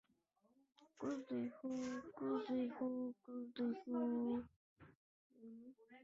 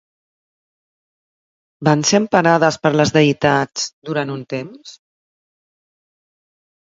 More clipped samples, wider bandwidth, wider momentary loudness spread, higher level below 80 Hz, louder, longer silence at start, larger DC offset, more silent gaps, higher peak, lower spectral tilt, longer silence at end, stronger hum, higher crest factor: neither; about the same, 7.6 kHz vs 7.8 kHz; first, 18 LU vs 12 LU; second, -82 dBFS vs -56 dBFS; second, -45 LUFS vs -16 LUFS; second, 0.8 s vs 1.8 s; neither; first, 4.56-4.76 s, 4.95-5.30 s vs 3.93-4.02 s; second, -32 dBFS vs 0 dBFS; about the same, -5.5 dB/octave vs -4.5 dB/octave; second, 0 s vs 2 s; neither; second, 14 dB vs 20 dB